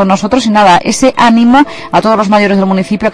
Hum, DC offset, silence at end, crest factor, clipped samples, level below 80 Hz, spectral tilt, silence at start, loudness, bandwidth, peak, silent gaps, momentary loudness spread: none; under 0.1%; 0 s; 8 dB; 0.4%; -38 dBFS; -5 dB/octave; 0 s; -8 LUFS; 11 kHz; 0 dBFS; none; 5 LU